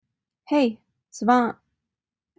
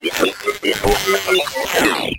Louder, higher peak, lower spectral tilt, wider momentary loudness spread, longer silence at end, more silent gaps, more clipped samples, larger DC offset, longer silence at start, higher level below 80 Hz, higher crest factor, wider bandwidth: second, -23 LUFS vs -17 LUFS; second, -6 dBFS vs 0 dBFS; first, -5 dB/octave vs -2.5 dB/octave; first, 20 LU vs 3 LU; first, 0.85 s vs 0 s; neither; neither; neither; first, 0.5 s vs 0 s; second, -70 dBFS vs -36 dBFS; about the same, 20 dB vs 18 dB; second, 8 kHz vs 17 kHz